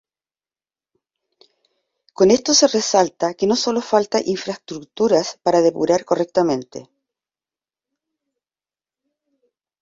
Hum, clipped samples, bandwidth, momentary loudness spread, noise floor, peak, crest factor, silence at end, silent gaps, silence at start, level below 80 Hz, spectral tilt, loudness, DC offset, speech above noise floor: none; under 0.1%; 7.8 kHz; 12 LU; under -90 dBFS; -2 dBFS; 18 dB; 3 s; none; 2.2 s; -62 dBFS; -3.5 dB/octave; -18 LUFS; under 0.1%; over 72 dB